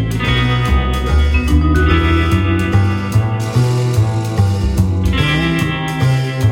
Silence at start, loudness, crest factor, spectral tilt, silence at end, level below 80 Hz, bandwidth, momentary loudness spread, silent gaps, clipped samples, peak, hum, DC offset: 0 s; -15 LUFS; 12 dB; -6.5 dB/octave; 0 s; -20 dBFS; 16.5 kHz; 3 LU; none; under 0.1%; -2 dBFS; none; under 0.1%